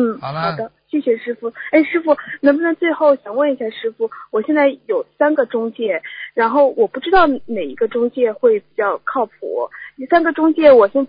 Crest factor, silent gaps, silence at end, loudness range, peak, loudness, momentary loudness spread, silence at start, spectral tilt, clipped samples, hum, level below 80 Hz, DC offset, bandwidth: 16 dB; none; 0 s; 2 LU; 0 dBFS; -17 LUFS; 10 LU; 0 s; -10.5 dB/octave; under 0.1%; none; -54 dBFS; under 0.1%; 5.2 kHz